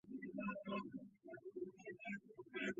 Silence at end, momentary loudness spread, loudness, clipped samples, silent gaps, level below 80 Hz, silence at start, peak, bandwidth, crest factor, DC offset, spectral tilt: 0 s; 9 LU; -50 LUFS; under 0.1%; none; -82 dBFS; 0.05 s; -32 dBFS; 7.4 kHz; 18 dB; under 0.1%; -4.5 dB/octave